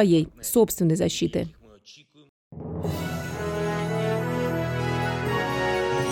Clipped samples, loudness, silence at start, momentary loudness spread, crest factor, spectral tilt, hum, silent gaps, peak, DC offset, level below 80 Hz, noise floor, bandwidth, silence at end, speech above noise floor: under 0.1%; -25 LUFS; 0 s; 9 LU; 20 dB; -5.5 dB/octave; none; 2.29-2.51 s; -6 dBFS; under 0.1%; -48 dBFS; -52 dBFS; 18 kHz; 0 s; 30 dB